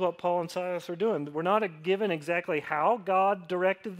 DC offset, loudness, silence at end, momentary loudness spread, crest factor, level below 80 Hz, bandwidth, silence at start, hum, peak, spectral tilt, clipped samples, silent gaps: under 0.1%; -29 LUFS; 0 s; 5 LU; 16 dB; -78 dBFS; 15.5 kHz; 0 s; none; -12 dBFS; -6 dB/octave; under 0.1%; none